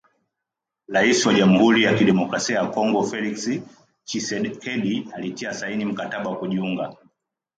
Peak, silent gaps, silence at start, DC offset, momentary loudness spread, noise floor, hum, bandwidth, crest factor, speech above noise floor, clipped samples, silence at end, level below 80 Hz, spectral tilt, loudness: -4 dBFS; none; 0.9 s; under 0.1%; 13 LU; -85 dBFS; none; 9.2 kHz; 18 dB; 63 dB; under 0.1%; 0.65 s; -62 dBFS; -4.5 dB/octave; -21 LUFS